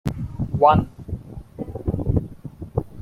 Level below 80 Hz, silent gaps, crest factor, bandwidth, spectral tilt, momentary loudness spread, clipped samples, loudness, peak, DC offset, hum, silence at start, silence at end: -36 dBFS; none; 20 dB; 14 kHz; -9 dB/octave; 19 LU; under 0.1%; -22 LUFS; -2 dBFS; under 0.1%; none; 0.05 s; 0 s